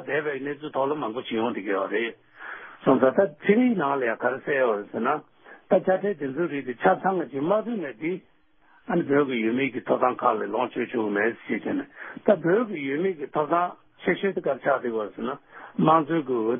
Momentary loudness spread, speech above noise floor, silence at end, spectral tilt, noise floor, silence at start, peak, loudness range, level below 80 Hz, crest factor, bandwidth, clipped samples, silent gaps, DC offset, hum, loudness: 10 LU; 36 dB; 0 s; -11 dB/octave; -61 dBFS; 0 s; -6 dBFS; 2 LU; -70 dBFS; 20 dB; 3.7 kHz; under 0.1%; none; under 0.1%; none; -25 LUFS